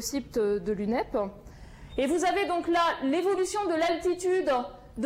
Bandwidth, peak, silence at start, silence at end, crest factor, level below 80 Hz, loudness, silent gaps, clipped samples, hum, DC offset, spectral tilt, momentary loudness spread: 16 kHz; -16 dBFS; 0 s; 0 s; 12 dB; -52 dBFS; -28 LUFS; none; under 0.1%; none; under 0.1%; -4 dB/octave; 6 LU